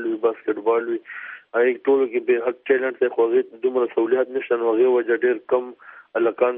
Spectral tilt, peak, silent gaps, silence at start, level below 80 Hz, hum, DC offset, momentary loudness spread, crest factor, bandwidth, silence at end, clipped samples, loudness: -3 dB/octave; -6 dBFS; none; 0 s; -80 dBFS; none; under 0.1%; 8 LU; 16 dB; 3.7 kHz; 0 s; under 0.1%; -21 LUFS